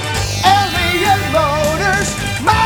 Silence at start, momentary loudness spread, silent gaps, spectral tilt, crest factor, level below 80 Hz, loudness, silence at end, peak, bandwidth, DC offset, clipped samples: 0 s; 5 LU; none; -3.5 dB/octave; 12 dB; -30 dBFS; -14 LUFS; 0 s; -2 dBFS; over 20 kHz; under 0.1%; under 0.1%